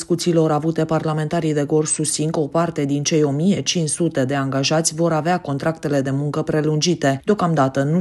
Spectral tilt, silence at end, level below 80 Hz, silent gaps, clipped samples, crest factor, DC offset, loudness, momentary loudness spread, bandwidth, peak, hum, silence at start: -5 dB/octave; 0 s; -56 dBFS; none; under 0.1%; 16 dB; under 0.1%; -19 LUFS; 3 LU; 12.5 kHz; -4 dBFS; none; 0 s